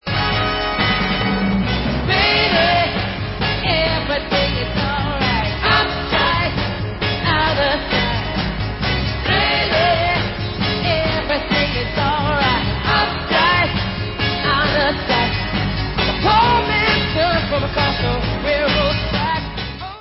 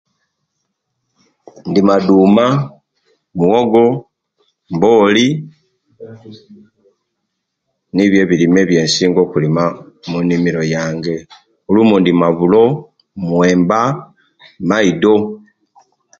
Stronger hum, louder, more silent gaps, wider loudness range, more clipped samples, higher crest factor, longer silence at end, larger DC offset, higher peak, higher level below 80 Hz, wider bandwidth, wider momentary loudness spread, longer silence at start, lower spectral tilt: neither; second, -17 LUFS vs -13 LUFS; neither; about the same, 2 LU vs 4 LU; neither; about the same, 16 dB vs 14 dB; second, 0 s vs 0.85 s; neither; about the same, -2 dBFS vs 0 dBFS; first, -30 dBFS vs -50 dBFS; second, 5.8 kHz vs 8.8 kHz; second, 6 LU vs 14 LU; second, 0.05 s vs 1.65 s; first, -9 dB/octave vs -6 dB/octave